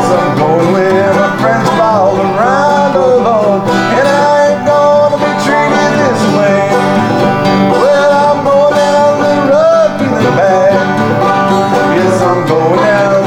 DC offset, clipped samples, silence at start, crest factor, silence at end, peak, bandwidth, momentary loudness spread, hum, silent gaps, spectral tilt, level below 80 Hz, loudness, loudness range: under 0.1%; under 0.1%; 0 s; 8 dB; 0 s; 0 dBFS; 14.5 kHz; 3 LU; none; none; -6 dB/octave; -48 dBFS; -9 LUFS; 1 LU